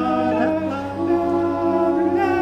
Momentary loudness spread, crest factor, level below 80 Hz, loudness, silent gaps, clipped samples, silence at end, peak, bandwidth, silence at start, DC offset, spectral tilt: 5 LU; 12 dB; -50 dBFS; -20 LUFS; none; under 0.1%; 0 s; -8 dBFS; 7.6 kHz; 0 s; under 0.1%; -8 dB/octave